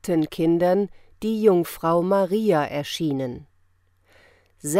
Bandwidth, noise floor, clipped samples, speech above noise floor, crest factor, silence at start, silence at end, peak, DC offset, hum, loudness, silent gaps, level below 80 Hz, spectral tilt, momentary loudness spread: 16 kHz; -62 dBFS; under 0.1%; 40 dB; 16 dB; 0.05 s; 0 s; -6 dBFS; under 0.1%; none; -22 LUFS; none; -56 dBFS; -6 dB/octave; 12 LU